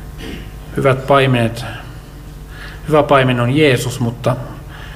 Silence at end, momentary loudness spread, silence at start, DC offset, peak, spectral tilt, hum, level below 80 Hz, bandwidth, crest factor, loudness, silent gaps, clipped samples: 0 s; 21 LU; 0 s; under 0.1%; 0 dBFS; -6 dB/octave; none; -34 dBFS; 16 kHz; 16 dB; -14 LUFS; none; under 0.1%